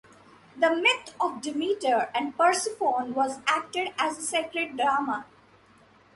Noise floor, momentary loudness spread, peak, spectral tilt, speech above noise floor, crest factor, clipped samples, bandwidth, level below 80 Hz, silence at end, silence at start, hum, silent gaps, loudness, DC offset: -58 dBFS; 7 LU; -8 dBFS; -1.5 dB/octave; 31 dB; 20 dB; under 0.1%; 11.5 kHz; -72 dBFS; 0.9 s; 0.55 s; none; none; -26 LUFS; under 0.1%